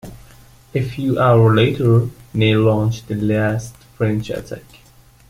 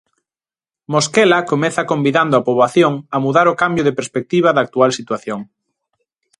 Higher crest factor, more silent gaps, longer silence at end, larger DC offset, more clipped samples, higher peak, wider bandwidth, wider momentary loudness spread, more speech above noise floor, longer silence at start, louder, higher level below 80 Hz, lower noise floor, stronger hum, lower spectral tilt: about the same, 16 dB vs 16 dB; neither; second, 0.7 s vs 0.95 s; neither; neither; about the same, -2 dBFS vs 0 dBFS; first, 14.5 kHz vs 11.5 kHz; first, 14 LU vs 10 LU; second, 29 dB vs over 75 dB; second, 0.05 s vs 0.9 s; about the same, -17 LUFS vs -15 LUFS; first, -44 dBFS vs -60 dBFS; second, -45 dBFS vs under -90 dBFS; neither; first, -7.5 dB/octave vs -5 dB/octave